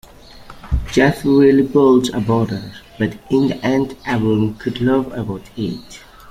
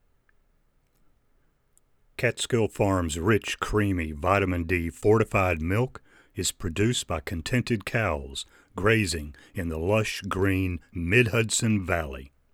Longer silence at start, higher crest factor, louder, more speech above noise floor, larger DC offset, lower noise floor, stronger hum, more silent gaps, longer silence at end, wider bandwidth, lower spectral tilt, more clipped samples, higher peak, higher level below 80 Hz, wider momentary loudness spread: second, 0.35 s vs 2.2 s; about the same, 16 dB vs 20 dB; first, -17 LUFS vs -26 LUFS; second, 23 dB vs 40 dB; neither; second, -39 dBFS vs -66 dBFS; neither; neither; second, 0 s vs 0.25 s; second, 15.5 kHz vs 17.5 kHz; first, -7 dB/octave vs -5 dB/octave; neither; first, -2 dBFS vs -6 dBFS; first, -34 dBFS vs -46 dBFS; first, 13 LU vs 10 LU